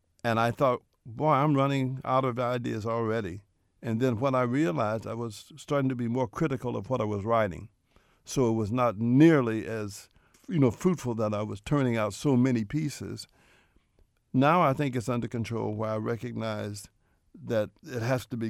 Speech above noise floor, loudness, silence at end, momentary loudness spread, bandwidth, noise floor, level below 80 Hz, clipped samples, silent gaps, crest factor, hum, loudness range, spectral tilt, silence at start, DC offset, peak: 39 dB; -28 LUFS; 0 s; 13 LU; 15 kHz; -66 dBFS; -60 dBFS; under 0.1%; none; 20 dB; none; 4 LU; -7 dB/octave; 0.25 s; under 0.1%; -8 dBFS